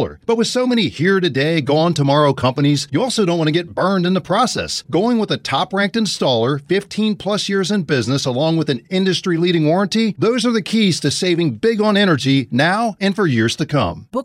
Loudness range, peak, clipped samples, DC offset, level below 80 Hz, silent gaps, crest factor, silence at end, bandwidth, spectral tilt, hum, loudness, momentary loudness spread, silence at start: 2 LU; -2 dBFS; under 0.1%; under 0.1%; -54 dBFS; none; 14 dB; 0 s; 15 kHz; -5.5 dB/octave; none; -17 LUFS; 4 LU; 0 s